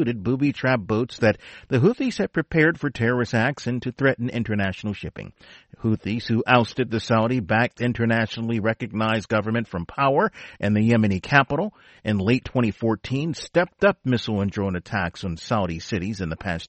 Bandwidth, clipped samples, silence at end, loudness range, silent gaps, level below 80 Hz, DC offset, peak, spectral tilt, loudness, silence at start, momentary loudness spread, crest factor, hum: 8.4 kHz; under 0.1%; 0.05 s; 3 LU; none; -50 dBFS; under 0.1%; -2 dBFS; -7 dB/octave; -23 LUFS; 0 s; 9 LU; 20 dB; none